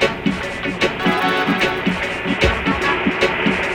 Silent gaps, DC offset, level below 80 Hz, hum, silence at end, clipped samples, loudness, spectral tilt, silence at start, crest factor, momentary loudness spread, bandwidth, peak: none; under 0.1%; -34 dBFS; none; 0 s; under 0.1%; -18 LUFS; -5 dB/octave; 0 s; 16 dB; 5 LU; 18 kHz; -2 dBFS